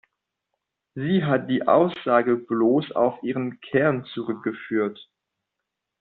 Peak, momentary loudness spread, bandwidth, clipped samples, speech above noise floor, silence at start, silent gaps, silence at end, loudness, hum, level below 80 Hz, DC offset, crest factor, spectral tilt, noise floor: -4 dBFS; 10 LU; 4.5 kHz; under 0.1%; 60 dB; 0.95 s; none; 0.95 s; -23 LUFS; none; -68 dBFS; under 0.1%; 20 dB; -5.5 dB/octave; -83 dBFS